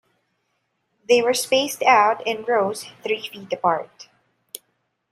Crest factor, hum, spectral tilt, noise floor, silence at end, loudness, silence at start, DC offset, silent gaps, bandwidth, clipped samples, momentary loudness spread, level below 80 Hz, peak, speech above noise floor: 20 dB; none; -2.5 dB/octave; -72 dBFS; 1.1 s; -20 LUFS; 1.1 s; under 0.1%; none; 16 kHz; under 0.1%; 23 LU; -74 dBFS; -2 dBFS; 52 dB